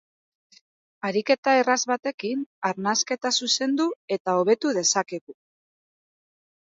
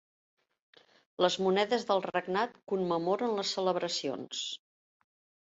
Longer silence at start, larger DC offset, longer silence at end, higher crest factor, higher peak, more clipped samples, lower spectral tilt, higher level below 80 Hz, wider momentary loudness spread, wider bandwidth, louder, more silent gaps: second, 1.05 s vs 1.2 s; neither; first, 1.35 s vs 0.85 s; about the same, 20 dB vs 20 dB; first, -6 dBFS vs -14 dBFS; neither; second, -2.5 dB/octave vs -4 dB/octave; about the same, -78 dBFS vs -78 dBFS; about the same, 9 LU vs 8 LU; about the same, 8 kHz vs 8 kHz; first, -24 LUFS vs -31 LUFS; first, 1.38-1.43 s, 2.14-2.18 s, 2.46-2.62 s, 3.96-4.08 s, 4.20-4.25 s, 5.21-5.27 s vs none